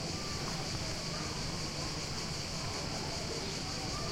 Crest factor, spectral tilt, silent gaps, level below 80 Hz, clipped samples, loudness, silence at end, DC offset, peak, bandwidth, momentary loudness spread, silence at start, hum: 12 dB; -3.5 dB/octave; none; -50 dBFS; under 0.1%; -37 LUFS; 0 s; under 0.1%; -24 dBFS; 16.5 kHz; 1 LU; 0 s; none